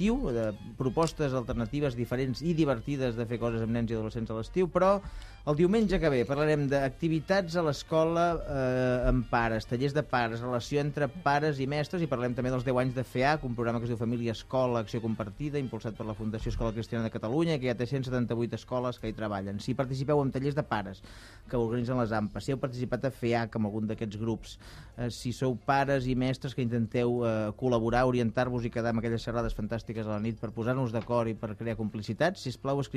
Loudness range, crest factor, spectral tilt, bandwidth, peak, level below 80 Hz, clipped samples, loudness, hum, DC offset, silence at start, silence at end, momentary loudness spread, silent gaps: 4 LU; 18 dB; -7 dB/octave; 13.5 kHz; -12 dBFS; -46 dBFS; under 0.1%; -30 LUFS; none; under 0.1%; 0 s; 0 s; 8 LU; none